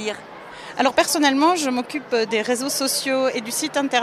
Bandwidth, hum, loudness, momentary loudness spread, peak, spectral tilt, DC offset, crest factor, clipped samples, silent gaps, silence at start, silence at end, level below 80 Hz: 15.5 kHz; none; -20 LUFS; 14 LU; -4 dBFS; -2 dB/octave; under 0.1%; 16 dB; under 0.1%; none; 0 s; 0 s; -64 dBFS